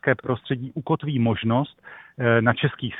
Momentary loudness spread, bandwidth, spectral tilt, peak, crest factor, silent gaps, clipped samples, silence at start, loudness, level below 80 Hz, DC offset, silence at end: 10 LU; 4 kHz; -10.5 dB/octave; -2 dBFS; 20 dB; none; under 0.1%; 0.05 s; -23 LUFS; -56 dBFS; under 0.1%; 0 s